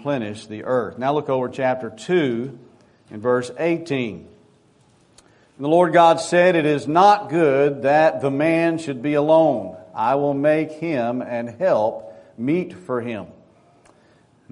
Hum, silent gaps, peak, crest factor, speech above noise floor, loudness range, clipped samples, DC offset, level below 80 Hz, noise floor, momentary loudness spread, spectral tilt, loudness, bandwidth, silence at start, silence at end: none; none; 0 dBFS; 20 dB; 37 dB; 8 LU; under 0.1%; under 0.1%; -66 dBFS; -56 dBFS; 13 LU; -6.5 dB/octave; -20 LUFS; 11 kHz; 0 s; 1.25 s